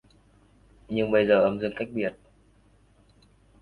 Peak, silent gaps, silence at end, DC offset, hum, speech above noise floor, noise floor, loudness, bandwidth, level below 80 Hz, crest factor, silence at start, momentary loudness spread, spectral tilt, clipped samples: -8 dBFS; none; 1.5 s; under 0.1%; 50 Hz at -50 dBFS; 36 dB; -60 dBFS; -25 LUFS; 4.7 kHz; -58 dBFS; 20 dB; 0.9 s; 11 LU; -8 dB/octave; under 0.1%